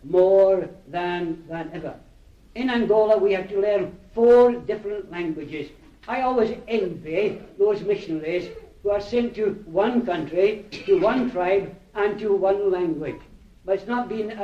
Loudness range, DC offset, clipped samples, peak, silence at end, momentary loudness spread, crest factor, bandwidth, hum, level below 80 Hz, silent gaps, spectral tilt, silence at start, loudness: 4 LU; under 0.1%; under 0.1%; -6 dBFS; 0 s; 15 LU; 16 dB; 7.4 kHz; none; -52 dBFS; none; -7 dB/octave; 0.05 s; -23 LUFS